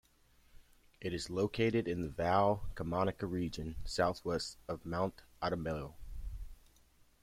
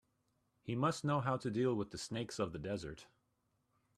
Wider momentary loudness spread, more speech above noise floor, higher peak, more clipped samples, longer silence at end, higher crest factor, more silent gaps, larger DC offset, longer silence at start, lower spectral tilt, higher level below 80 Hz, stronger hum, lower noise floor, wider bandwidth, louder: first, 17 LU vs 11 LU; second, 32 dB vs 43 dB; first, -16 dBFS vs -22 dBFS; neither; second, 0.65 s vs 0.95 s; about the same, 20 dB vs 18 dB; neither; neither; about the same, 0.55 s vs 0.65 s; about the same, -6 dB/octave vs -6 dB/octave; first, -52 dBFS vs -68 dBFS; neither; second, -67 dBFS vs -81 dBFS; first, 16 kHz vs 13 kHz; first, -36 LUFS vs -39 LUFS